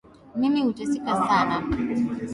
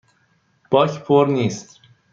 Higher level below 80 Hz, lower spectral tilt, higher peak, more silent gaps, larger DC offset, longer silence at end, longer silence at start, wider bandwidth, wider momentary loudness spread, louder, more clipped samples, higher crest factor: first, -46 dBFS vs -64 dBFS; about the same, -6 dB/octave vs -6.5 dB/octave; second, -8 dBFS vs -2 dBFS; neither; neither; second, 0 s vs 0.5 s; second, 0.25 s vs 0.7 s; first, 11.5 kHz vs 7.6 kHz; about the same, 6 LU vs 8 LU; second, -24 LUFS vs -18 LUFS; neither; about the same, 18 dB vs 18 dB